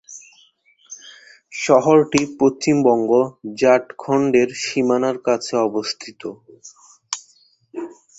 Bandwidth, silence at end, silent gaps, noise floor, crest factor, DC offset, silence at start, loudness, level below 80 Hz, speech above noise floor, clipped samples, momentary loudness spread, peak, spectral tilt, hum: 8.2 kHz; 0.3 s; none; -56 dBFS; 18 dB; under 0.1%; 0.1 s; -18 LUFS; -60 dBFS; 39 dB; under 0.1%; 20 LU; -2 dBFS; -5 dB/octave; none